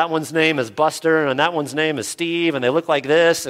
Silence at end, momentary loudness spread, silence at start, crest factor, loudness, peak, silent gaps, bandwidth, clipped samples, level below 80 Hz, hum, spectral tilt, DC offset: 0 s; 5 LU; 0 s; 16 dB; -19 LUFS; -2 dBFS; none; 16 kHz; under 0.1%; -64 dBFS; none; -4 dB/octave; under 0.1%